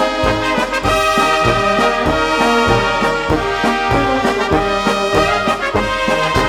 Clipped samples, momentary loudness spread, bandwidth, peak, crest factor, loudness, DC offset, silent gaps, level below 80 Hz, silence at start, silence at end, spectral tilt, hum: under 0.1%; 3 LU; 17.5 kHz; 0 dBFS; 14 dB; -14 LUFS; under 0.1%; none; -30 dBFS; 0 s; 0 s; -4.5 dB/octave; none